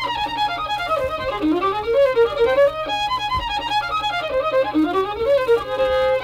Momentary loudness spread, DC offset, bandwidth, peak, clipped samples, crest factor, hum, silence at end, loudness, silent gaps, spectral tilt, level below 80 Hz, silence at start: 5 LU; under 0.1%; 15.5 kHz; -8 dBFS; under 0.1%; 12 dB; none; 0 s; -20 LUFS; none; -5 dB/octave; -42 dBFS; 0 s